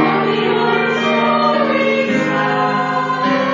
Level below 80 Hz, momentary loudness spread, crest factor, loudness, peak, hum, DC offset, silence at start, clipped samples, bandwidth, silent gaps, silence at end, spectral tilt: -60 dBFS; 2 LU; 14 dB; -15 LUFS; -2 dBFS; none; under 0.1%; 0 s; under 0.1%; 7.6 kHz; none; 0 s; -6 dB/octave